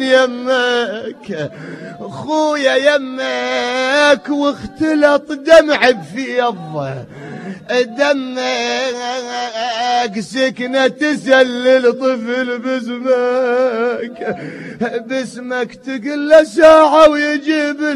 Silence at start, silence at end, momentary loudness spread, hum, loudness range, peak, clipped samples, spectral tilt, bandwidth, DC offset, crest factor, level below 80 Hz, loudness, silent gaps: 0 s; 0 s; 15 LU; none; 6 LU; 0 dBFS; 0.2%; -4 dB/octave; 11.5 kHz; under 0.1%; 14 dB; -52 dBFS; -14 LUFS; none